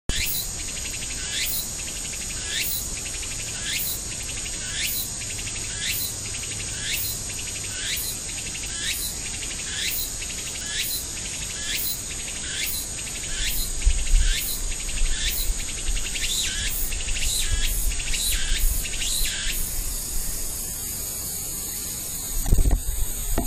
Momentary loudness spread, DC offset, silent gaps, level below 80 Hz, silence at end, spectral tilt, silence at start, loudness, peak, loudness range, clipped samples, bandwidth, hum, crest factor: 5 LU; under 0.1%; none; -30 dBFS; 0 s; -1 dB/octave; 0.1 s; -26 LUFS; -4 dBFS; 2 LU; under 0.1%; 16 kHz; none; 22 dB